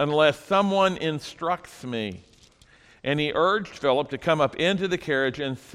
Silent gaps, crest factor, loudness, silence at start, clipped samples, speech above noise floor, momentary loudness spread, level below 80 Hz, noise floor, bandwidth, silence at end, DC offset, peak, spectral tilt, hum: none; 18 dB; -25 LUFS; 0 s; under 0.1%; 31 dB; 10 LU; -58 dBFS; -55 dBFS; 14.5 kHz; 0.15 s; under 0.1%; -6 dBFS; -5.5 dB/octave; none